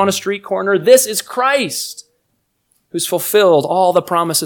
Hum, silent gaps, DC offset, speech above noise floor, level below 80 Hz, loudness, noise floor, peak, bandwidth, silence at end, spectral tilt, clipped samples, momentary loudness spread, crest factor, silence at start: none; none; under 0.1%; 52 dB; -66 dBFS; -14 LUFS; -67 dBFS; 0 dBFS; 19.5 kHz; 0 s; -3 dB/octave; 0.2%; 12 LU; 16 dB; 0 s